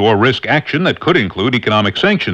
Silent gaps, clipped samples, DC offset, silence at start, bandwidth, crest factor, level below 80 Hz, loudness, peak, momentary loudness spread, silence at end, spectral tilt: none; under 0.1%; under 0.1%; 0 s; 8.6 kHz; 14 dB; -46 dBFS; -14 LUFS; 0 dBFS; 3 LU; 0 s; -6.5 dB/octave